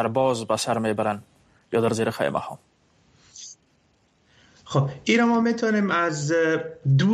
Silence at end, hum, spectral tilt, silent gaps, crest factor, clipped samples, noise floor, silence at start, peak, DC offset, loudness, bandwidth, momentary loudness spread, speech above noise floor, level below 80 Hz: 0 s; none; -5.5 dB/octave; none; 16 dB; under 0.1%; -64 dBFS; 0 s; -8 dBFS; under 0.1%; -23 LUFS; 13.5 kHz; 17 LU; 42 dB; -62 dBFS